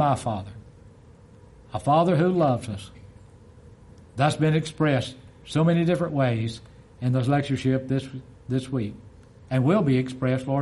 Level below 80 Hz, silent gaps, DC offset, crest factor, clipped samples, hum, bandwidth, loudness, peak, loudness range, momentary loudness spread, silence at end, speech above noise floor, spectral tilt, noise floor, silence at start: -54 dBFS; none; under 0.1%; 18 dB; under 0.1%; none; 11.5 kHz; -24 LUFS; -6 dBFS; 2 LU; 15 LU; 0 s; 27 dB; -7.5 dB/octave; -50 dBFS; 0 s